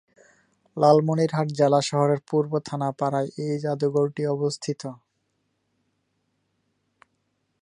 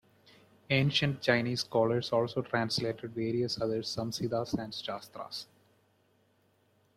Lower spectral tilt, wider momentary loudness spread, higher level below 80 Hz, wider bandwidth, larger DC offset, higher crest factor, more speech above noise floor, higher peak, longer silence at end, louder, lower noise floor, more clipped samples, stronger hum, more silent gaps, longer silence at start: about the same, -6.5 dB/octave vs -5.5 dB/octave; about the same, 11 LU vs 13 LU; second, -72 dBFS vs -66 dBFS; second, 11 kHz vs 14.5 kHz; neither; about the same, 20 dB vs 22 dB; first, 51 dB vs 38 dB; first, -4 dBFS vs -12 dBFS; first, 2.65 s vs 1.55 s; first, -24 LUFS vs -32 LUFS; first, -74 dBFS vs -70 dBFS; neither; neither; neither; about the same, 0.75 s vs 0.7 s